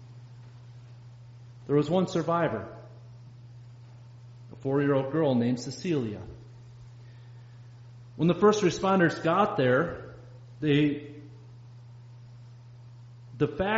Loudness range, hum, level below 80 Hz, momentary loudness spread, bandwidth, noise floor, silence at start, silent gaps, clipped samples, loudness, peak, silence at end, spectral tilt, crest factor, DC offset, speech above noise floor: 7 LU; none; -60 dBFS; 25 LU; 7.6 kHz; -48 dBFS; 0 s; none; under 0.1%; -27 LUFS; -10 dBFS; 0 s; -6 dB/octave; 20 dB; under 0.1%; 23 dB